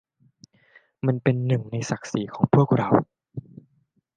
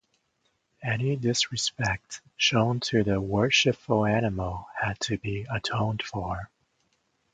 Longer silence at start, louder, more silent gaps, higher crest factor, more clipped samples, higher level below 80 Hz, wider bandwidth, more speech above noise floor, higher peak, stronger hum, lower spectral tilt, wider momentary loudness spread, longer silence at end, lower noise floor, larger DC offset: first, 1.05 s vs 0.8 s; first, -23 LUFS vs -27 LUFS; neither; about the same, 22 dB vs 20 dB; neither; second, -62 dBFS vs -50 dBFS; about the same, 9.2 kHz vs 9.4 kHz; about the same, 46 dB vs 47 dB; first, -2 dBFS vs -8 dBFS; neither; first, -7.5 dB/octave vs -4.5 dB/octave; first, 19 LU vs 11 LU; about the same, 0.75 s vs 0.85 s; second, -68 dBFS vs -73 dBFS; neither